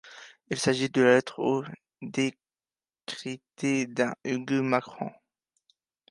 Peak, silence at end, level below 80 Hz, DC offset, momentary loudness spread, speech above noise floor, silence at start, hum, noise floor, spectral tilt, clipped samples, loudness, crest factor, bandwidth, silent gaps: -8 dBFS; 1 s; -74 dBFS; under 0.1%; 18 LU; over 63 dB; 0.05 s; none; under -90 dBFS; -5 dB/octave; under 0.1%; -28 LUFS; 22 dB; 11.5 kHz; none